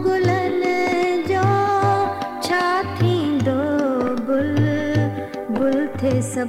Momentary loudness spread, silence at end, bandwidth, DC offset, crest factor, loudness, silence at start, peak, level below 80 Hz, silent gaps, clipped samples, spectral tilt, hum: 4 LU; 0 s; 15 kHz; under 0.1%; 14 dB; -20 LUFS; 0 s; -6 dBFS; -52 dBFS; none; under 0.1%; -6.5 dB/octave; none